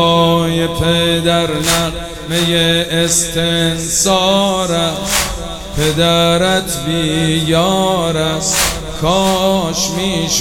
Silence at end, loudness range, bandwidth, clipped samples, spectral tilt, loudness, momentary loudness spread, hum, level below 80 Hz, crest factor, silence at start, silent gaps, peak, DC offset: 0 s; 1 LU; 18 kHz; under 0.1%; -3.5 dB/octave; -13 LUFS; 5 LU; none; -32 dBFS; 14 dB; 0 s; none; 0 dBFS; under 0.1%